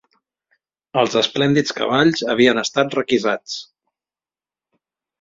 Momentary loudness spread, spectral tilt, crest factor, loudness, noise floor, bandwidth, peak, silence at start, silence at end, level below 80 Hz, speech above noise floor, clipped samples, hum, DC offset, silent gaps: 9 LU; -4.5 dB/octave; 18 dB; -18 LUFS; under -90 dBFS; 7.8 kHz; -2 dBFS; 0.95 s; 1.6 s; -60 dBFS; over 72 dB; under 0.1%; none; under 0.1%; none